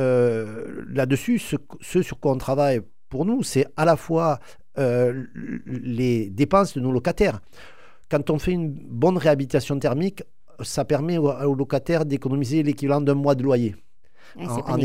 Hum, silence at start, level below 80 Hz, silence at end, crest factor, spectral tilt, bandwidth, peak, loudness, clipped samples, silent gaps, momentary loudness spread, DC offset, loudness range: none; 0 s; -46 dBFS; 0 s; 18 dB; -7 dB/octave; 16 kHz; -4 dBFS; -23 LUFS; under 0.1%; none; 11 LU; 0.9%; 1 LU